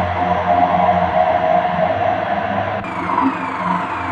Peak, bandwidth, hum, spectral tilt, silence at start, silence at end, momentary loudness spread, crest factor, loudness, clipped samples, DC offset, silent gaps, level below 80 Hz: -2 dBFS; 8.4 kHz; none; -7.5 dB/octave; 0 s; 0 s; 6 LU; 14 dB; -17 LUFS; under 0.1%; under 0.1%; none; -46 dBFS